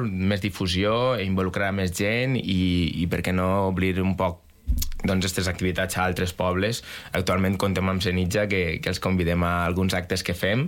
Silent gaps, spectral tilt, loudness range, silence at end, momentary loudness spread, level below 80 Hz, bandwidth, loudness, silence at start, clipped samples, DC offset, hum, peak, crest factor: none; -5.5 dB/octave; 1 LU; 0 s; 4 LU; -38 dBFS; 17 kHz; -24 LUFS; 0 s; under 0.1%; under 0.1%; none; -10 dBFS; 14 dB